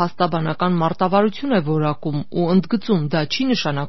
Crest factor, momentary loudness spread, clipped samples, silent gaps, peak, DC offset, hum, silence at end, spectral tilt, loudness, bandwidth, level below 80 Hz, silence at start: 16 dB; 4 LU; under 0.1%; none; -2 dBFS; 2%; none; 0 s; -5.5 dB/octave; -20 LUFS; 6.2 kHz; -56 dBFS; 0 s